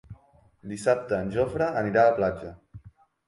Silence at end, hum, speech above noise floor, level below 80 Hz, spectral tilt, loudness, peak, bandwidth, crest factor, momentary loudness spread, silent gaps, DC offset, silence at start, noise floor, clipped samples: 0.4 s; none; 34 dB; -52 dBFS; -6.5 dB/octave; -25 LUFS; -8 dBFS; 11.5 kHz; 18 dB; 18 LU; none; under 0.1%; 0.1 s; -59 dBFS; under 0.1%